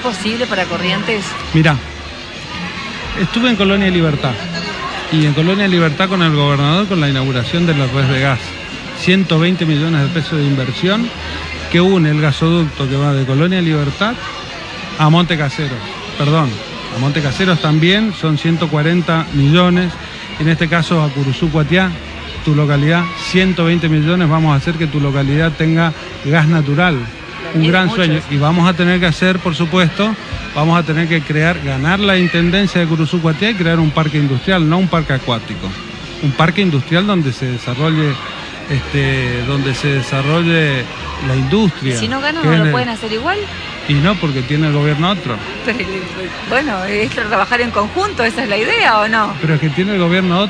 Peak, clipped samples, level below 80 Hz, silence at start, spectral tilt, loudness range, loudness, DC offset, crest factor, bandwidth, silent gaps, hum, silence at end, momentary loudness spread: 0 dBFS; under 0.1%; -36 dBFS; 0 s; -6.5 dB/octave; 3 LU; -14 LUFS; under 0.1%; 14 dB; 10 kHz; none; none; 0 s; 10 LU